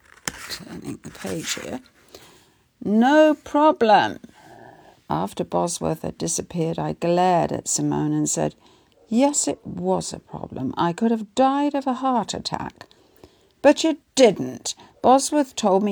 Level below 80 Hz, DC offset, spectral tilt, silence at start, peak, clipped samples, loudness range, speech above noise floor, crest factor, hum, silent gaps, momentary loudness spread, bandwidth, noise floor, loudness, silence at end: -58 dBFS; under 0.1%; -4.5 dB/octave; 0.25 s; -2 dBFS; under 0.1%; 4 LU; 35 dB; 20 dB; none; none; 16 LU; over 20 kHz; -56 dBFS; -21 LUFS; 0 s